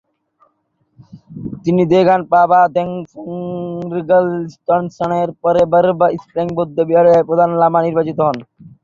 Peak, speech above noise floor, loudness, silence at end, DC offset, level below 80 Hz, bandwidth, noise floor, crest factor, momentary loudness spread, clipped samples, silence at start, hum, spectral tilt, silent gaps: -2 dBFS; 50 dB; -15 LUFS; 0.15 s; under 0.1%; -54 dBFS; 7.2 kHz; -64 dBFS; 14 dB; 13 LU; under 0.1%; 1.15 s; none; -8.5 dB/octave; none